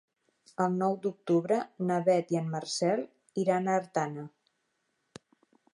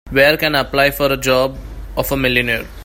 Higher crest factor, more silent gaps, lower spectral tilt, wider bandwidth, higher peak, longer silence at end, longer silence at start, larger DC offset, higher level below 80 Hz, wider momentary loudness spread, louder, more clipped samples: about the same, 18 dB vs 16 dB; neither; first, -6 dB/octave vs -4 dB/octave; second, 11 kHz vs 16.5 kHz; second, -14 dBFS vs 0 dBFS; first, 1.45 s vs 0 s; first, 0.6 s vs 0.05 s; neither; second, -82 dBFS vs -32 dBFS; about the same, 9 LU vs 10 LU; second, -30 LUFS vs -15 LUFS; neither